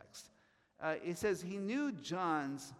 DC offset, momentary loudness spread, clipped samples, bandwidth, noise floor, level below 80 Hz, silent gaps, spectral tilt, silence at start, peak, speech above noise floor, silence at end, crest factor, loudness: under 0.1%; 7 LU; under 0.1%; 15.5 kHz; -72 dBFS; -76 dBFS; none; -5 dB/octave; 0.05 s; -22 dBFS; 34 dB; 0 s; 18 dB; -39 LUFS